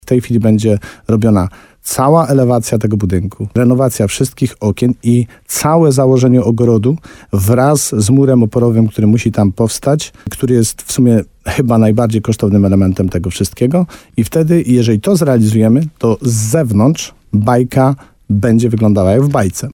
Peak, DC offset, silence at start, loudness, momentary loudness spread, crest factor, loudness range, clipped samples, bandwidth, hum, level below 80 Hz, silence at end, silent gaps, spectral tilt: 0 dBFS; under 0.1%; 0.05 s; -12 LUFS; 7 LU; 12 dB; 2 LU; under 0.1%; 18 kHz; none; -40 dBFS; 0 s; none; -6.5 dB/octave